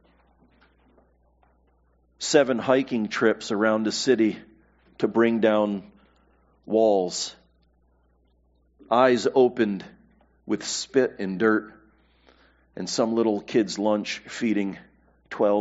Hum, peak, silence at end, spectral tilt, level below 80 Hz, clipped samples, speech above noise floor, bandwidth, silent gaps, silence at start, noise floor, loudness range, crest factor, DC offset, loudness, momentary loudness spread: 60 Hz at -65 dBFS; -4 dBFS; 0 s; -4 dB/octave; -64 dBFS; under 0.1%; 41 dB; 8 kHz; none; 2.2 s; -64 dBFS; 4 LU; 20 dB; under 0.1%; -24 LUFS; 11 LU